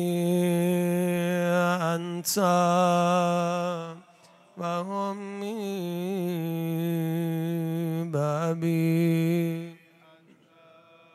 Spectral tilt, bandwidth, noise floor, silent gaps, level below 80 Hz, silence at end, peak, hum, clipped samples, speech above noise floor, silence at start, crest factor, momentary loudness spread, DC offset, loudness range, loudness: -6 dB/octave; 15.5 kHz; -57 dBFS; none; -78 dBFS; 1.4 s; -10 dBFS; none; under 0.1%; 32 dB; 0 s; 16 dB; 10 LU; under 0.1%; 7 LU; -27 LUFS